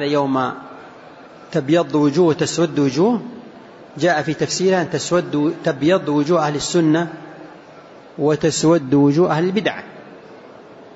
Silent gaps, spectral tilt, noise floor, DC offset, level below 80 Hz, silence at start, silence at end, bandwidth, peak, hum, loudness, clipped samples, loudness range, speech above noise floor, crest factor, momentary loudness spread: none; -5.5 dB/octave; -41 dBFS; under 0.1%; -58 dBFS; 0 s; 0.05 s; 8 kHz; -4 dBFS; none; -18 LUFS; under 0.1%; 1 LU; 24 dB; 14 dB; 20 LU